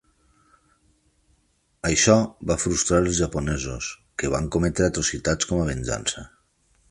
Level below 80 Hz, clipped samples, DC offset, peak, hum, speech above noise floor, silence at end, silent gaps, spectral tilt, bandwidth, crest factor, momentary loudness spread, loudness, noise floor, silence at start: -38 dBFS; under 0.1%; under 0.1%; -4 dBFS; none; 43 dB; 0.65 s; none; -4 dB/octave; 11.5 kHz; 22 dB; 11 LU; -23 LUFS; -66 dBFS; 1.85 s